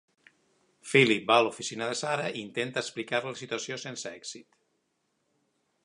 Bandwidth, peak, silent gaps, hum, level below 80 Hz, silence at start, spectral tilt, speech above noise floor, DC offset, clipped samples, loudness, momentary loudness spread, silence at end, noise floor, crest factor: 11.5 kHz; -6 dBFS; none; none; -78 dBFS; 0.85 s; -3.5 dB/octave; 48 dB; under 0.1%; under 0.1%; -28 LUFS; 17 LU; 1.4 s; -77 dBFS; 24 dB